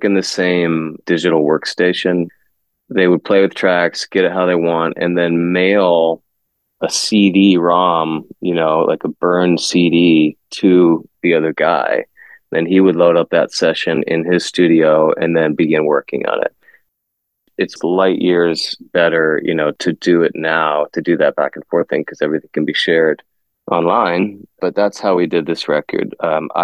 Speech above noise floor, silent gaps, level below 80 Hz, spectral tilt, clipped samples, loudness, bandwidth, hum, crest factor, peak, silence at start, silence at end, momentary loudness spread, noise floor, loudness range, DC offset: 59 dB; none; -60 dBFS; -5 dB/octave; under 0.1%; -15 LUFS; 12 kHz; none; 14 dB; 0 dBFS; 0 s; 0 s; 8 LU; -73 dBFS; 3 LU; under 0.1%